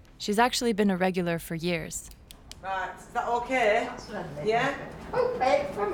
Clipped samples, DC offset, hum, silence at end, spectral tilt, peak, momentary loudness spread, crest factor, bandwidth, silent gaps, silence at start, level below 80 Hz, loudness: under 0.1%; under 0.1%; none; 0 s; -4.5 dB/octave; -8 dBFS; 13 LU; 20 dB; 19 kHz; none; 0.2 s; -52 dBFS; -28 LUFS